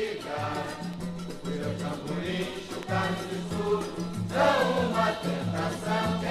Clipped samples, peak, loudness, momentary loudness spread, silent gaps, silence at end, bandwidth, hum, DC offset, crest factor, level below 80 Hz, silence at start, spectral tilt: under 0.1%; -10 dBFS; -30 LUFS; 10 LU; none; 0 s; 14.5 kHz; none; under 0.1%; 18 dB; -54 dBFS; 0 s; -5.5 dB/octave